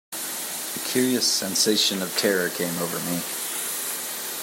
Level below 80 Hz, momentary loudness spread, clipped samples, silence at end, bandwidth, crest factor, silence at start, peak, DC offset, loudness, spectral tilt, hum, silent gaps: -74 dBFS; 8 LU; under 0.1%; 0 s; 16.5 kHz; 18 dB; 0.1 s; -8 dBFS; under 0.1%; -23 LUFS; -2 dB/octave; none; none